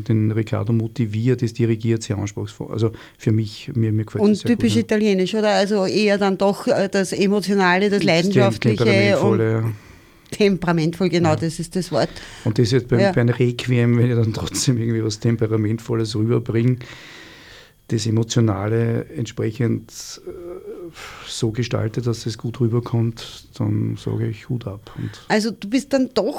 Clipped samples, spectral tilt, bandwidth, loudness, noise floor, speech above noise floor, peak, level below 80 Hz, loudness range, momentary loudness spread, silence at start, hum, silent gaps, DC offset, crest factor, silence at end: under 0.1%; -6 dB/octave; 15 kHz; -20 LUFS; -45 dBFS; 26 dB; -4 dBFS; -50 dBFS; 7 LU; 13 LU; 0 s; none; none; under 0.1%; 16 dB; 0 s